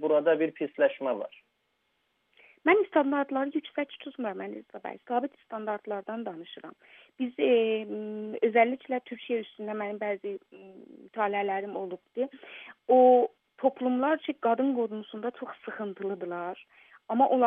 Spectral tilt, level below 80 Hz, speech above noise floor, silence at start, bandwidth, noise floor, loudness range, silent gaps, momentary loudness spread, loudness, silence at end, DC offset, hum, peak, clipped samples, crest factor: -8.5 dB/octave; -88 dBFS; 47 dB; 0 s; 3.8 kHz; -76 dBFS; 8 LU; none; 16 LU; -29 LUFS; 0 s; under 0.1%; none; -10 dBFS; under 0.1%; 20 dB